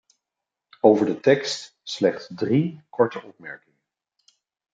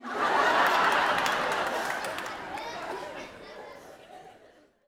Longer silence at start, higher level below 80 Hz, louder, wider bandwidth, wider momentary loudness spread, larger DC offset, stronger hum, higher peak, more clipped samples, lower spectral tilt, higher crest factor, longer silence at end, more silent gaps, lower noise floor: first, 0.85 s vs 0 s; second, -72 dBFS vs -64 dBFS; first, -22 LUFS vs -27 LUFS; second, 9.2 kHz vs over 20 kHz; about the same, 21 LU vs 22 LU; neither; neither; first, -2 dBFS vs -8 dBFS; neither; first, -6 dB/octave vs -2 dB/octave; about the same, 22 dB vs 22 dB; first, 1.15 s vs 0.55 s; neither; first, -86 dBFS vs -58 dBFS